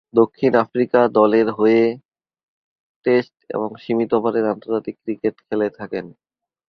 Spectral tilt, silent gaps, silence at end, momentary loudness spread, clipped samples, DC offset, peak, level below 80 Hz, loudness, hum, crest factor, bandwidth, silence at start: -8.5 dB/octave; 2.05-2.09 s, 2.43-3.02 s; 0.6 s; 12 LU; under 0.1%; under 0.1%; 0 dBFS; -62 dBFS; -19 LUFS; none; 18 dB; 6 kHz; 0.15 s